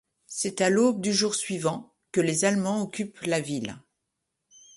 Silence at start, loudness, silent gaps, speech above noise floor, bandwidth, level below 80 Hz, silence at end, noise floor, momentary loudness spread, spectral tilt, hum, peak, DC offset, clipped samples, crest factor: 0.3 s; -26 LUFS; none; 56 dB; 11.5 kHz; -68 dBFS; 1 s; -82 dBFS; 10 LU; -4 dB/octave; none; -10 dBFS; under 0.1%; under 0.1%; 18 dB